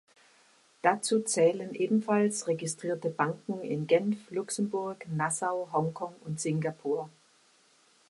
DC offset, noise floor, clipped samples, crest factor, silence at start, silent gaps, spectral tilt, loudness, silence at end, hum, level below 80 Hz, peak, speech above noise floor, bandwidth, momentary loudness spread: under 0.1%; -64 dBFS; under 0.1%; 22 dB; 0.85 s; none; -5 dB/octave; -30 LUFS; 1 s; none; -76 dBFS; -10 dBFS; 35 dB; 11.5 kHz; 9 LU